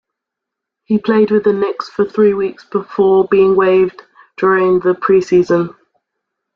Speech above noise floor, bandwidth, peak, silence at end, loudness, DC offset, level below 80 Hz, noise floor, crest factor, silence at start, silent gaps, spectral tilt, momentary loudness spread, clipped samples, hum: 68 dB; 7 kHz; -2 dBFS; 0.85 s; -14 LUFS; under 0.1%; -54 dBFS; -81 dBFS; 12 dB; 0.9 s; none; -7.5 dB/octave; 8 LU; under 0.1%; none